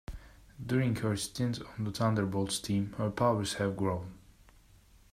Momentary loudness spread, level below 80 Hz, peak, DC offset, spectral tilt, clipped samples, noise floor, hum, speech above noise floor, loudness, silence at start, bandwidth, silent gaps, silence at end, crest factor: 11 LU; -56 dBFS; -16 dBFS; under 0.1%; -5.5 dB/octave; under 0.1%; -60 dBFS; none; 29 dB; -32 LUFS; 0.1 s; 15.5 kHz; none; 0.95 s; 18 dB